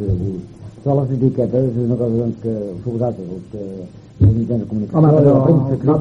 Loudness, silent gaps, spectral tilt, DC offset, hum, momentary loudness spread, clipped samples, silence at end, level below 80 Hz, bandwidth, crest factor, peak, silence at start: -17 LUFS; none; -11.5 dB/octave; under 0.1%; none; 18 LU; under 0.1%; 0 s; -38 dBFS; 5.8 kHz; 16 dB; 0 dBFS; 0 s